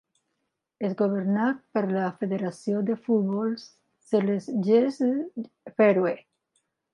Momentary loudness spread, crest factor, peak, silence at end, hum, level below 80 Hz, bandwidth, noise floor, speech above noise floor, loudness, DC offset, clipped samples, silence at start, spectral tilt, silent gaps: 11 LU; 16 dB; -10 dBFS; 0.75 s; none; -78 dBFS; 10.5 kHz; -80 dBFS; 55 dB; -26 LUFS; under 0.1%; under 0.1%; 0.8 s; -8 dB/octave; none